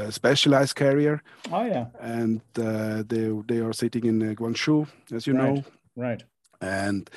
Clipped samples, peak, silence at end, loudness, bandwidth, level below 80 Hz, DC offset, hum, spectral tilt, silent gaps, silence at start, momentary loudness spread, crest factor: under 0.1%; -8 dBFS; 0 s; -25 LUFS; 12.5 kHz; -70 dBFS; under 0.1%; none; -5.5 dB/octave; none; 0 s; 12 LU; 18 dB